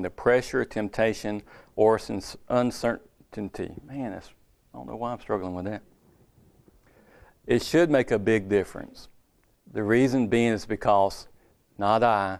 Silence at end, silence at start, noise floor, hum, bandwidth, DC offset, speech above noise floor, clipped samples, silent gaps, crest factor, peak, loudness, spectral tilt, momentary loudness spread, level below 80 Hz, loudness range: 0 s; 0 s; -64 dBFS; none; 14.5 kHz; under 0.1%; 38 dB; under 0.1%; none; 20 dB; -6 dBFS; -26 LUFS; -6 dB/octave; 16 LU; -54 dBFS; 11 LU